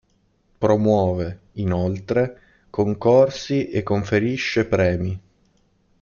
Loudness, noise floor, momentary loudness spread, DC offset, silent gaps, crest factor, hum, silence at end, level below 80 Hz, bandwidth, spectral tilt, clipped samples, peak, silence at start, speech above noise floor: -21 LUFS; -63 dBFS; 11 LU; under 0.1%; none; 18 dB; none; 0.8 s; -50 dBFS; 7.2 kHz; -7 dB/octave; under 0.1%; -4 dBFS; 0.6 s; 44 dB